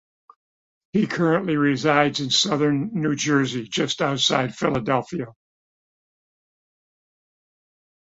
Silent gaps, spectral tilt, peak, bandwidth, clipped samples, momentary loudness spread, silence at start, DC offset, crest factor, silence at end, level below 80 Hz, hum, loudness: none; -4.5 dB/octave; -4 dBFS; 8 kHz; under 0.1%; 6 LU; 0.95 s; under 0.1%; 22 dB; 2.8 s; -60 dBFS; none; -21 LUFS